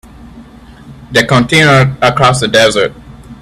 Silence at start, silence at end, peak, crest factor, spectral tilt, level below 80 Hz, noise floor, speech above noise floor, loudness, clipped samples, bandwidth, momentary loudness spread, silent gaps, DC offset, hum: 0.2 s; 0.05 s; 0 dBFS; 12 dB; -4.5 dB/octave; -38 dBFS; -34 dBFS; 26 dB; -9 LUFS; 0.1%; 14.5 kHz; 7 LU; none; under 0.1%; none